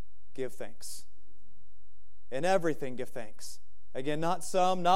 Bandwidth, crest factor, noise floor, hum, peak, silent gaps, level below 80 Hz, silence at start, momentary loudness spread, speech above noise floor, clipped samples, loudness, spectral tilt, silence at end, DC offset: 16 kHz; 22 dB; -67 dBFS; none; -12 dBFS; none; -64 dBFS; 0.35 s; 18 LU; 35 dB; under 0.1%; -34 LUFS; -4.5 dB/octave; 0 s; 3%